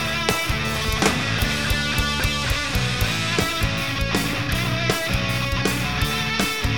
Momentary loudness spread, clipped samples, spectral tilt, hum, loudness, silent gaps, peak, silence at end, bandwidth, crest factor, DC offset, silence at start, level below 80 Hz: 2 LU; under 0.1%; -3.5 dB/octave; none; -21 LUFS; none; -2 dBFS; 0 s; over 20 kHz; 20 dB; 1%; 0 s; -32 dBFS